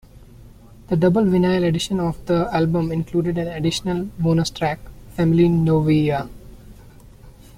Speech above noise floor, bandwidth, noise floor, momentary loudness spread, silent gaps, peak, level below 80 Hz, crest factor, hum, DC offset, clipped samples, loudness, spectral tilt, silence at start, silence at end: 25 dB; 14.5 kHz; -44 dBFS; 9 LU; none; -4 dBFS; -42 dBFS; 16 dB; none; under 0.1%; under 0.1%; -20 LUFS; -7 dB/octave; 0.4 s; 0.3 s